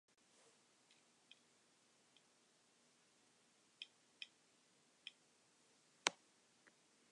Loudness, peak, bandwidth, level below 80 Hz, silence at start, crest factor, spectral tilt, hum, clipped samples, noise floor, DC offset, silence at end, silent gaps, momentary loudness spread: -49 LUFS; -16 dBFS; 10.5 kHz; under -90 dBFS; 3.8 s; 42 dB; 0.5 dB/octave; none; under 0.1%; -76 dBFS; under 0.1%; 1 s; none; 25 LU